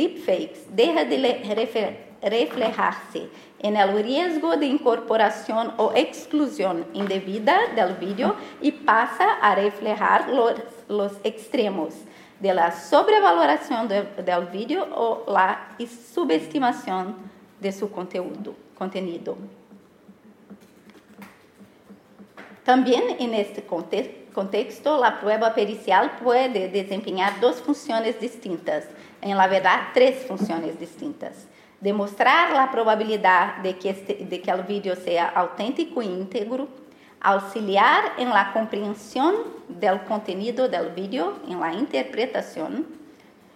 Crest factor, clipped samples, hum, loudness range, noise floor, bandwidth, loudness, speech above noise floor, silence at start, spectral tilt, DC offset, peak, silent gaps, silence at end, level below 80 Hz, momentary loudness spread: 18 dB; under 0.1%; none; 6 LU; -51 dBFS; 15.5 kHz; -23 LUFS; 29 dB; 0 s; -5 dB/octave; under 0.1%; -4 dBFS; none; 0.5 s; -76 dBFS; 12 LU